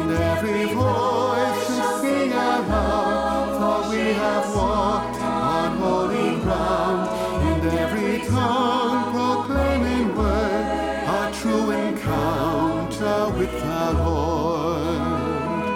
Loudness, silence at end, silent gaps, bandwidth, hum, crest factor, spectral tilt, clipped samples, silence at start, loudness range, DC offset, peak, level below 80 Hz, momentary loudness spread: -22 LUFS; 0 s; none; 17.5 kHz; none; 12 dB; -6 dB/octave; under 0.1%; 0 s; 1 LU; under 0.1%; -8 dBFS; -34 dBFS; 3 LU